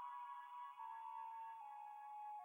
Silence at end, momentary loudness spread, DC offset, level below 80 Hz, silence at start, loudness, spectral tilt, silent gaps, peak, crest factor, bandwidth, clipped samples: 0 s; 3 LU; under 0.1%; under -90 dBFS; 0 s; -53 LUFS; 0 dB/octave; none; -42 dBFS; 10 dB; 16 kHz; under 0.1%